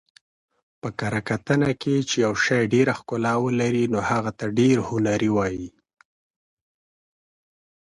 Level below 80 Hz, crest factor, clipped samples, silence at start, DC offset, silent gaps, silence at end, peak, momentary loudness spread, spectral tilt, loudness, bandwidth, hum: -54 dBFS; 18 dB; under 0.1%; 0.85 s; under 0.1%; none; 2.15 s; -6 dBFS; 8 LU; -5.5 dB/octave; -22 LUFS; 11.5 kHz; none